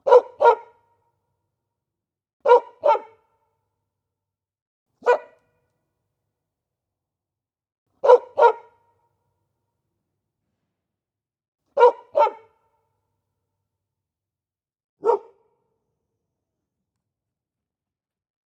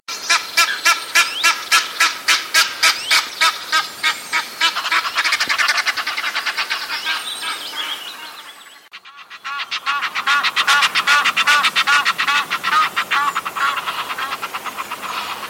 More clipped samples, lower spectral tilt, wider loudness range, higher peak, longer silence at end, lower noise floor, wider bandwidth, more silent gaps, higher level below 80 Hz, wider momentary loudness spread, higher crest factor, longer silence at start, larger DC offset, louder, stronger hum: neither; first, -3 dB/octave vs 2 dB/octave; about the same, 9 LU vs 8 LU; about the same, 0 dBFS vs -2 dBFS; first, 3.35 s vs 0 s; first, under -90 dBFS vs -41 dBFS; second, 7.4 kHz vs 17 kHz; first, 2.33-2.40 s, 4.62-4.86 s, 7.78-7.86 s, 11.48-11.52 s, 14.84-14.97 s vs none; second, -86 dBFS vs -68 dBFS; about the same, 10 LU vs 12 LU; first, 24 dB vs 18 dB; about the same, 0.05 s vs 0.1 s; neither; second, -19 LUFS vs -16 LUFS; neither